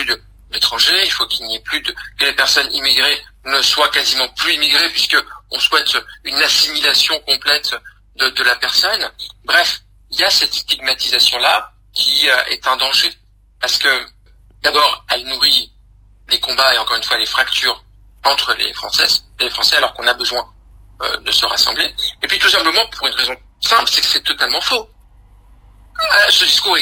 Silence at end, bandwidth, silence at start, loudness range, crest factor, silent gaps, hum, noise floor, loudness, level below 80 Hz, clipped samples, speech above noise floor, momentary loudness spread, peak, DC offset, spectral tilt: 0 s; 16 kHz; 0 s; 2 LU; 16 dB; none; none; -47 dBFS; -13 LUFS; -46 dBFS; under 0.1%; 31 dB; 9 LU; 0 dBFS; under 0.1%; 0.5 dB/octave